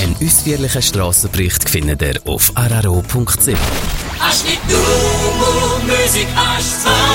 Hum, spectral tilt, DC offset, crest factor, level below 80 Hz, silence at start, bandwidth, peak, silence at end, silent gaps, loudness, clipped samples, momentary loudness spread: none; -3 dB/octave; under 0.1%; 14 dB; -24 dBFS; 0 s; 17 kHz; 0 dBFS; 0 s; none; -13 LUFS; under 0.1%; 5 LU